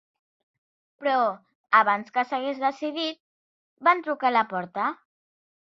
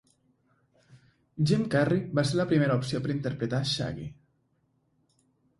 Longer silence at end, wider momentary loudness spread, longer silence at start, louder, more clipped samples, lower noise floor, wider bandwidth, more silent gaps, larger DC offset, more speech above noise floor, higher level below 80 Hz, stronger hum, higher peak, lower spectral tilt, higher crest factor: second, 0.75 s vs 1.45 s; about the same, 10 LU vs 10 LU; second, 1 s vs 1.35 s; first, -25 LUFS vs -28 LUFS; neither; first, under -90 dBFS vs -72 dBFS; second, 7.6 kHz vs 11.5 kHz; first, 1.55-1.64 s, 3.20-3.77 s vs none; neither; first, over 66 dB vs 45 dB; second, -80 dBFS vs -60 dBFS; neither; first, -4 dBFS vs -10 dBFS; second, -5 dB/octave vs -6.5 dB/octave; about the same, 22 dB vs 20 dB